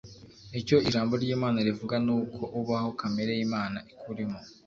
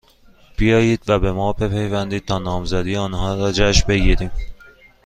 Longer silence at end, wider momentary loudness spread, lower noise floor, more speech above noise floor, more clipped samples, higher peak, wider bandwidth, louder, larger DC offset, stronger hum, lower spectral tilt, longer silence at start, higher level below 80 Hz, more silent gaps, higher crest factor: second, 0.15 s vs 0.5 s; first, 11 LU vs 8 LU; about the same, -49 dBFS vs -49 dBFS; second, 20 dB vs 32 dB; neither; second, -10 dBFS vs 0 dBFS; second, 7.4 kHz vs 9.8 kHz; second, -29 LUFS vs -19 LUFS; neither; neither; about the same, -6.5 dB/octave vs -5.5 dB/octave; second, 0.05 s vs 0.6 s; second, -60 dBFS vs -26 dBFS; neither; about the same, 20 dB vs 18 dB